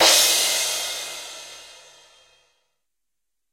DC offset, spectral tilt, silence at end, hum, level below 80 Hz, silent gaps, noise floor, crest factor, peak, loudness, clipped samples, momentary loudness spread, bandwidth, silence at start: under 0.1%; 2 dB/octave; 1.8 s; none; -64 dBFS; none; -84 dBFS; 22 dB; -2 dBFS; -19 LUFS; under 0.1%; 24 LU; 16 kHz; 0 s